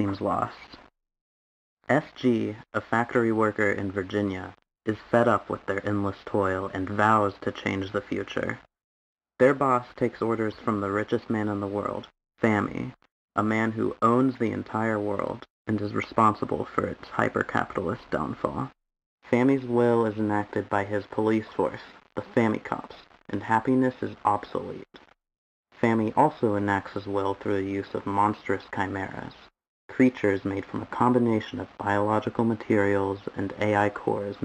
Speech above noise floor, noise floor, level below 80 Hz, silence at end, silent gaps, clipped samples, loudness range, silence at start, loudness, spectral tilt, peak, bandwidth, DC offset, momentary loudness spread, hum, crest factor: over 64 dB; under -90 dBFS; -60 dBFS; 0 s; 1.21-1.77 s, 8.84-9.16 s, 13.11-13.28 s, 15.50-15.65 s, 19.06-19.18 s, 25.38-25.64 s, 29.69-29.89 s; under 0.1%; 2 LU; 0 s; -27 LUFS; -7.5 dB/octave; -6 dBFS; 10.5 kHz; under 0.1%; 11 LU; none; 20 dB